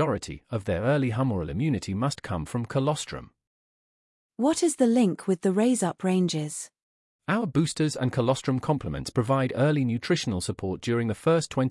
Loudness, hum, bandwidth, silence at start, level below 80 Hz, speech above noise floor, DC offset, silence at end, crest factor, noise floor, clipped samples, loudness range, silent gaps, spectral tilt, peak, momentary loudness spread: -26 LUFS; none; 12 kHz; 0 s; -54 dBFS; over 64 dB; under 0.1%; 0 s; 16 dB; under -90 dBFS; under 0.1%; 3 LU; 3.47-4.29 s, 6.82-7.19 s; -6 dB/octave; -10 dBFS; 8 LU